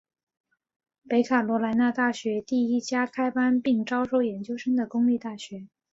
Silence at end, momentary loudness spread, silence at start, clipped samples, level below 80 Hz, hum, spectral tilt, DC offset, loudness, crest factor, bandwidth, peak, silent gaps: 0.25 s; 7 LU; 1.1 s; under 0.1%; -70 dBFS; none; -5.5 dB/octave; under 0.1%; -25 LUFS; 16 dB; 7.8 kHz; -10 dBFS; none